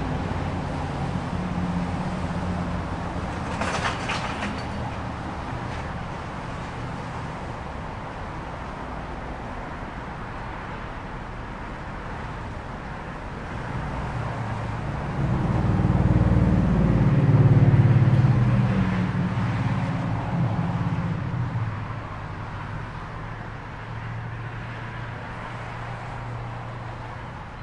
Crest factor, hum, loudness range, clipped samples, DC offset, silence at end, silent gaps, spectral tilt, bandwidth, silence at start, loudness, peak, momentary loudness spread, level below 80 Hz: 18 dB; none; 14 LU; under 0.1%; under 0.1%; 0 s; none; -7.5 dB/octave; 10.5 kHz; 0 s; -27 LUFS; -8 dBFS; 15 LU; -38 dBFS